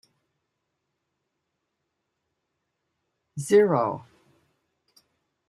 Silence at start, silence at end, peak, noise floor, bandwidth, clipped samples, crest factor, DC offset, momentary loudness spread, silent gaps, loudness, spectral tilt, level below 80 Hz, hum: 3.35 s; 1.5 s; -8 dBFS; -80 dBFS; 12.5 kHz; under 0.1%; 22 dB; under 0.1%; 20 LU; none; -22 LUFS; -6 dB/octave; -76 dBFS; none